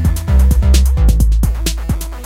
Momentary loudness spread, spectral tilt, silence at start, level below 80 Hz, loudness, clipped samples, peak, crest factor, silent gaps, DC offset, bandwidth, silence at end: 8 LU; -5.5 dB/octave; 0 s; -12 dBFS; -14 LUFS; under 0.1%; 0 dBFS; 12 dB; none; under 0.1%; 16 kHz; 0 s